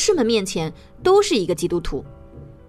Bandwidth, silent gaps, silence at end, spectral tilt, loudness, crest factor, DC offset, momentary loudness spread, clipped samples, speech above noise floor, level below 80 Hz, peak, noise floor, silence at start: 14 kHz; none; 0.15 s; -4 dB/octave; -20 LUFS; 16 dB; under 0.1%; 14 LU; under 0.1%; 21 dB; -40 dBFS; -4 dBFS; -41 dBFS; 0 s